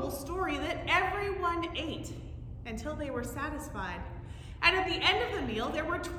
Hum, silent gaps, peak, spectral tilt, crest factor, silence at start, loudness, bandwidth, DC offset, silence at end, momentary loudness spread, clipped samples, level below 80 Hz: none; none; -10 dBFS; -4.5 dB/octave; 24 dB; 0 s; -32 LUFS; 18 kHz; under 0.1%; 0 s; 16 LU; under 0.1%; -46 dBFS